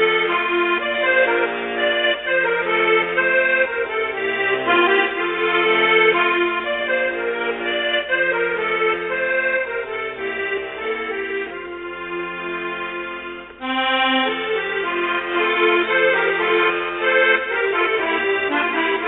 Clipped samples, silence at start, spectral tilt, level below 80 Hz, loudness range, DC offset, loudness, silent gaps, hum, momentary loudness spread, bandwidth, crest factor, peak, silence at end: under 0.1%; 0 s; -6.5 dB/octave; -56 dBFS; 7 LU; under 0.1%; -19 LUFS; none; none; 10 LU; 4.1 kHz; 16 dB; -4 dBFS; 0 s